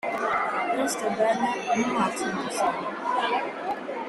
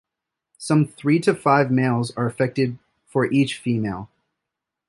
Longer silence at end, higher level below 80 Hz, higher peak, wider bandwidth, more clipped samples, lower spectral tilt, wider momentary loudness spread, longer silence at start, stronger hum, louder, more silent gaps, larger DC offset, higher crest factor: second, 0 s vs 0.85 s; second, -66 dBFS vs -58 dBFS; second, -10 dBFS vs -4 dBFS; first, 13.5 kHz vs 11.5 kHz; neither; second, -3.5 dB/octave vs -6.5 dB/octave; second, 5 LU vs 10 LU; second, 0.05 s vs 0.6 s; neither; second, -26 LUFS vs -21 LUFS; neither; neither; about the same, 16 dB vs 20 dB